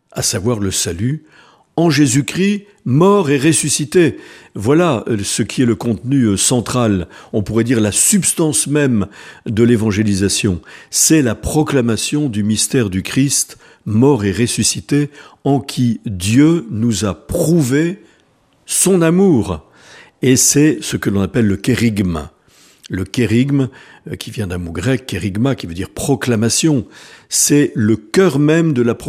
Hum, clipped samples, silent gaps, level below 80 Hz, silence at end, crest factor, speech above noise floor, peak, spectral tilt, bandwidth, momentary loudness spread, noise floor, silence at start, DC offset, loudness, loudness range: none; under 0.1%; none; -42 dBFS; 0 s; 16 dB; 40 dB; 0 dBFS; -4.5 dB/octave; 15.5 kHz; 11 LU; -55 dBFS; 0.15 s; under 0.1%; -15 LUFS; 4 LU